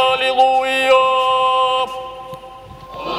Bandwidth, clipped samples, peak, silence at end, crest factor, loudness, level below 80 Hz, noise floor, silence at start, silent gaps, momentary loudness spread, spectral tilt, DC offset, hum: 14 kHz; under 0.1%; -2 dBFS; 0 s; 14 dB; -15 LUFS; -50 dBFS; -36 dBFS; 0 s; none; 20 LU; -2.5 dB/octave; under 0.1%; none